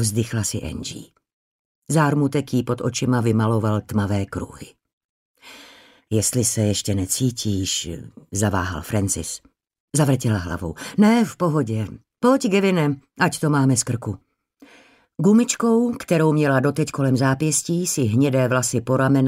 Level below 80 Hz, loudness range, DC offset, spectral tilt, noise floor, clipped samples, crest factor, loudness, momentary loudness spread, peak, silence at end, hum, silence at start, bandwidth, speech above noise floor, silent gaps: -50 dBFS; 5 LU; under 0.1%; -5 dB/octave; -53 dBFS; under 0.1%; 16 dB; -21 LUFS; 12 LU; -4 dBFS; 0 s; none; 0 s; 16 kHz; 33 dB; 1.33-1.82 s, 4.93-5.35 s, 9.80-9.88 s